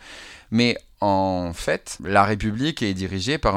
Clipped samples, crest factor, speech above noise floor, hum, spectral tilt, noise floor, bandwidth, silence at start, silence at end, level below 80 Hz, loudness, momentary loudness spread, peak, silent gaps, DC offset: under 0.1%; 22 dB; 21 dB; none; -5 dB/octave; -42 dBFS; 15 kHz; 0 s; 0 s; -42 dBFS; -23 LUFS; 7 LU; 0 dBFS; none; under 0.1%